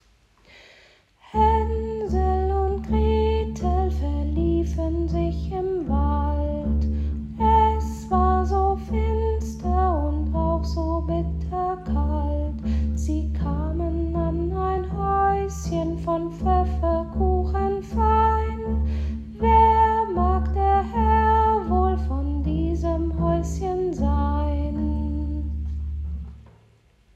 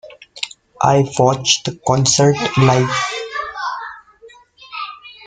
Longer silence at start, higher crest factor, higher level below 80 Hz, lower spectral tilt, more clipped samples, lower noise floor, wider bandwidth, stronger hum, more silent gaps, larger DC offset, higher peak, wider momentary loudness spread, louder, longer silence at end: first, 1.35 s vs 0.05 s; about the same, 16 dB vs 18 dB; first, -28 dBFS vs -50 dBFS; first, -8.5 dB/octave vs -4 dB/octave; neither; first, -57 dBFS vs -45 dBFS; second, 7.8 kHz vs 9.6 kHz; neither; neither; neither; second, -6 dBFS vs 0 dBFS; second, 8 LU vs 15 LU; second, -23 LUFS vs -16 LUFS; first, 0.75 s vs 0 s